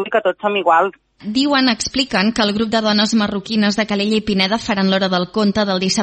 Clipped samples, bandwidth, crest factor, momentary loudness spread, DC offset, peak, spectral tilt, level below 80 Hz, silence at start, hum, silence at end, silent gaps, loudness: under 0.1%; 8.8 kHz; 16 dB; 4 LU; under 0.1%; 0 dBFS; -4.5 dB/octave; -48 dBFS; 0 s; none; 0 s; none; -16 LUFS